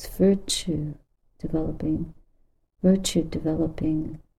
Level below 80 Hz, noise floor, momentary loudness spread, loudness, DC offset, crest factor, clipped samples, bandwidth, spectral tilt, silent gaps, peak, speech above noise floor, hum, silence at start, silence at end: -42 dBFS; -63 dBFS; 12 LU; -26 LUFS; under 0.1%; 18 dB; under 0.1%; 15 kHz; -5.5 dB/octave; none; -8 dBFS; 38 dB; none; 0 s; 0.2 s